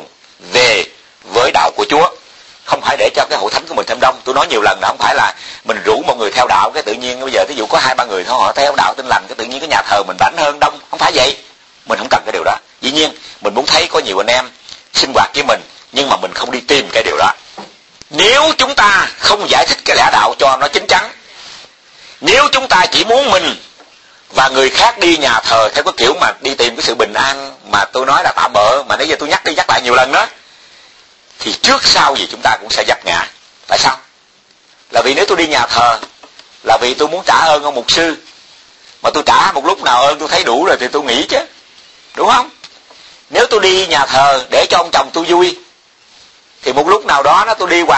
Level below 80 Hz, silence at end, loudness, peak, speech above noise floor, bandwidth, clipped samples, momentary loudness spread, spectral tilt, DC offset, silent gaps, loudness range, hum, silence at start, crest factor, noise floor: -46 dBFS; 0 s; -11 LUFS; 0 dBFS; 37 dB; 11 kHz; 0.1%; 9 LU; -2 dB/octave; 0.1%; none; 3 LU; none; 0 s; 12 dB; -49 dBFS